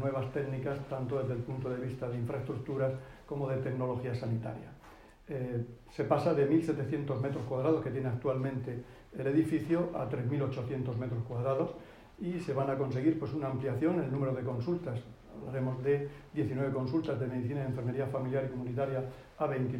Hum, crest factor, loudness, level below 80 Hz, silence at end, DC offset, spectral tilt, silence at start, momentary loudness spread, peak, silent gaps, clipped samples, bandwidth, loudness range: none; 18 dB; -34 LUFS; -60 dBFS; 0 s; under 0.1%; -9 dB/octave; 0 s; 10 LU; -14 dBFS; none; under 0.1%; 11 kHz; 4 LU